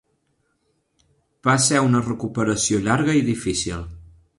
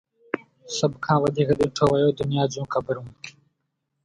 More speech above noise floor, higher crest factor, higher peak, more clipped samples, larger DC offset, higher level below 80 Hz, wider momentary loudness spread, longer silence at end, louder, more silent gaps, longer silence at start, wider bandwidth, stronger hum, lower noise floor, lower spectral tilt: second, 49 dB vs 55 dB; about the same, 18 dB vs 18 dB; about the same, -4 dBFS vs -6 dBFS; neither; neither; first, -46 dBFS vs -54 dBFS; second, 10 LU vs 13 LU; second, 0.35 s vs 0.75 s; first, -20 LUFS vs -24 LUFS; neither; first, 1.45 s vs 0.35 s; about the same, 11.5 kHz vs 11 kHz; neither; second, -69 dBFS vs -77 dBFS; second, -4.5 dB/octave vs -6 dB/octave